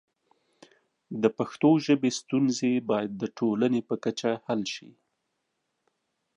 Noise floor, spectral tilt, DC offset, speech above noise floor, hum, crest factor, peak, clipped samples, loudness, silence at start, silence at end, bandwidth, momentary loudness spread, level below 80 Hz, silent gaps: -79 dBFS; -5.5 dB/octave; under 0.1%; 53 dB; none; 20 dB; -8 dBFS; under 0.1%; -27 LUFS; 1.1 s; 1.5 s; 10.5 kHz; 8 LU; -76 dBFS; none